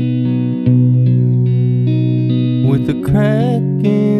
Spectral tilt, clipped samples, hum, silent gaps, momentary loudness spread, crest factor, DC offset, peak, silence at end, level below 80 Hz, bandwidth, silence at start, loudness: -10 dB/octave; under 0.1%; none; none; 4 LU; 12 dB; under 0.1%; -2 dBFS; 0 s; -42 dBFS; 4.3 kHz; 0 s; -14 LUFS